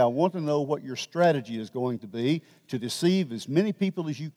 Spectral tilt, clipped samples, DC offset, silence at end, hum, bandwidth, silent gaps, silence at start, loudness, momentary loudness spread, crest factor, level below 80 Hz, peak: -6 dB/octave; under 0.1%; under 0.1%; 0.05 s; none; 15.5 kHz; none; 0 s; -27 LUFS; 9 LU; 16 dB; -80 dBFS; -10 dBFS